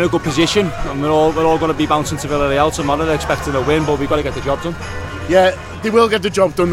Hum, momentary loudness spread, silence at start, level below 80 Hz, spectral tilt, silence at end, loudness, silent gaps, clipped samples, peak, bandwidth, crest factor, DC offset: none; 7 LU; 0 s; -32 dBFS; -5 dB/octave; 0 s; -16 LUFS; none; under 0.1%; 0 dBFS; 16 kHz; 16 dB; under 0.1%